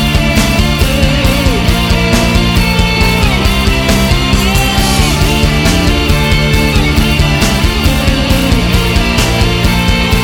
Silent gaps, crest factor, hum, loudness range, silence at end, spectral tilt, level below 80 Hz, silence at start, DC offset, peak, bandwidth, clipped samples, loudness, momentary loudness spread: none; 10 dB; none; 0 LU; 0 s; -4.5 dB/octave; -14 dBFS; 0 s; under 0.1%; 0 dBFS; 17.5 kHz; under 0.1%; -10 LUFS; 1 LU